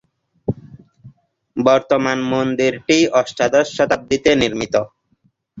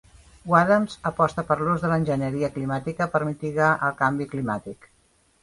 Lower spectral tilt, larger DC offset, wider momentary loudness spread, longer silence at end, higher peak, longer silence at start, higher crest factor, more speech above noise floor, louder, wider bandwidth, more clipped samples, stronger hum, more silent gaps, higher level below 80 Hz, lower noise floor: second, -4.5 dB/octave vs -7.5 dB/octave; neither; first, 12 LU vs 8 LU; second, 0 s vs 0.7 s; about the same, -2 dBFS vs -4 dBFS; about the same, 0.5 s vs 0.45 s; about the same, 16 dB vs 20 dB; first, 46 dB vs 39 dB; first, -17 LUFS vs -24 LUFS; second, 8 kHz vs 11.5 kHz; neither; neither; neither; about the same, -50 dBFS vs -54 dBFS; about the same, -62 dBFS vs -63 dBFS